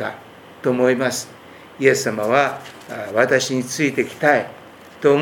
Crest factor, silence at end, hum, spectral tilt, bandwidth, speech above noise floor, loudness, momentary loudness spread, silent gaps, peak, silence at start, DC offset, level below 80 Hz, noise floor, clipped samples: 20 dB; 0 s; none; -4 dB/octave; 18 kHz; 22 dB; -19 LUFS; 16 LU; none; 0 dBFS; 0 s; under 0.1%; -66 dBFS; -41 dBFS; under 0.1%